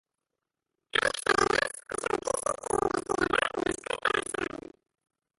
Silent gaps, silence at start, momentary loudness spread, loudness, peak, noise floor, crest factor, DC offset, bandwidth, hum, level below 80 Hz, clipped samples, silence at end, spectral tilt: none; 0.95 s; 9 LU; -29 LUFS; -10 dBFS; -87 dBFS; 22 dB; under 0.1%; 12 kHz; none; -56 dBFS; under 0.1%; 0.8 s; -2.5 dB/octave